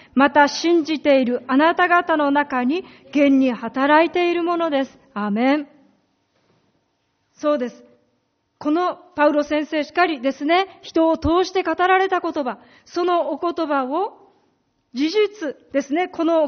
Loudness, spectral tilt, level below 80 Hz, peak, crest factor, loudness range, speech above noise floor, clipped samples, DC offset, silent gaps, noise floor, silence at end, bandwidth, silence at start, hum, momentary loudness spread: -20 LUFS; -2.5 dB/octave; -52 dBFS; -2 dBFS; 18 dB; 8 LU; 50 dB; under 0.1%; under 0.1%; none; -69 dBFS; 0 s; 6.6 kHz; 0.15 s; none; 10 LU